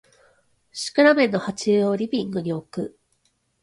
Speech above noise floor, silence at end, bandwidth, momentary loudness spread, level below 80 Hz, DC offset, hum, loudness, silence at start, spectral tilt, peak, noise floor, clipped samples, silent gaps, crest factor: 47 dB; 0.75 s; 11.5 kHz; 16 LU; -64 dBFS; under 0.1%; none; -22 LUFS; 0.75 s; -5 dB/octave; -4 dBFS; -68 dBFS; under 0.1%; none; 20 dB